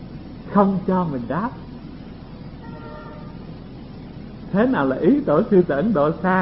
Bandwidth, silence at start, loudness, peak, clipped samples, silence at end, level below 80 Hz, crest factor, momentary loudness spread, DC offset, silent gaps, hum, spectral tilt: 5.8 kHz; 0 s; -19 LUFS; -2 dBFS; under 0.1%; 0 s; -44 dBFS; 20 dB; 20 LU; 0.2%; none; none; -12.5 dB/octave